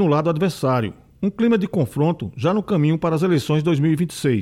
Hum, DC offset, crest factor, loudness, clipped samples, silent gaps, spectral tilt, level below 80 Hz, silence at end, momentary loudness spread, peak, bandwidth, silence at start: none; under 0.1%; 14 dB; -20 LUFS; under 0.1%; none; -7.5 dB/octave; -54 dBFS; 0 s; 5 LU; -6 dBFS; 15 kHz; 0 s